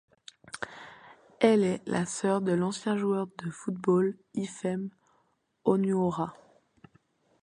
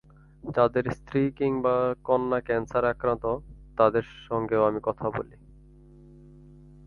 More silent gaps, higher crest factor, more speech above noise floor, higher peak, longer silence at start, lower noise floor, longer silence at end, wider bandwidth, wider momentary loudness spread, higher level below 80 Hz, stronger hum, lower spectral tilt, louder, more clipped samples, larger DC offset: neither; about the same, 22 dB vs 22 dB; first, 44 dB vs 26 dB; about the same, -8 dBFS vs -6 dBFS; about the same, 0.55 s vs 0.45 s; first, -72 dBFS vs -51 dBFS; second, 1.1 s vs 1.6 s; first, 11 kHz vs 6.8 kHz; first, 15 LU vs 9 LU; second, -70 dBFS vs -52 dBFS; neither; second, -6 dB/octave vs -8.5 dB/octave; second, -29 LUFS vs -26 LUFS; neither; neither